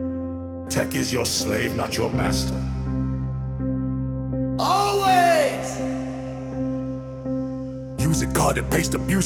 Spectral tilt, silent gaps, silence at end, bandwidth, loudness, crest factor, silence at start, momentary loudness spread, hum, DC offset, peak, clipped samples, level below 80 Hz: -5 dB/octave; none; 0 s; 18 kHz; -23 LUFS; 18 dB; 0 s; 11 LU; none; under 0.1%; -6 dBFS; under 0.1%; -36 dBFS